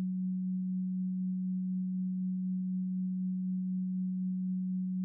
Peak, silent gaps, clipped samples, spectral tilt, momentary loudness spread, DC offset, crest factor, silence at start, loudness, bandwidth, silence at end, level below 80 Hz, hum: -30 dBFS; none; under 0.1%; -26 dB/octave; 0 LU; under 0.1%; 4 dB; 0 s; -35 LUFS; 0.3 kHz; 0 s; -90 dBFS; none